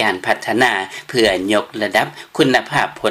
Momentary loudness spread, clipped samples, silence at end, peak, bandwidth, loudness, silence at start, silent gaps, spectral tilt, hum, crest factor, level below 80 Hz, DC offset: 5 LU; under 0.1%; 0 s; -2 dBFS; 16 kHz; -17 LUFS; 0 s; none; -4 dB/octave; none; 16 dB; -50 dBFS; under 0.1%